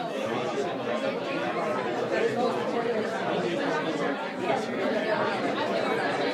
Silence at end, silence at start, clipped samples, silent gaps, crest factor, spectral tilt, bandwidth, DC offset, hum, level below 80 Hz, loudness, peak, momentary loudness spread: 0 s; 0 s; under 0.1%; none; 14 dB; -5 dB/octave; 13.5 kHz; under 0.1%; none; -74 dBFS; -28 LUFS; -12 dBFS; 3 LU